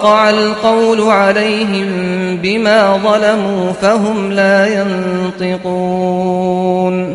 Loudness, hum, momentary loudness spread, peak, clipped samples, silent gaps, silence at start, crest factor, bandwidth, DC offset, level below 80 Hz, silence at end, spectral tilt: -12 LUFS; none; 7 LU; 0 dBFS; under 0.1%; none; 0 s; 12 dB; 11.5 kHz; under 0.1%; -50 dBFS; 0 s; -5.5 dB/octave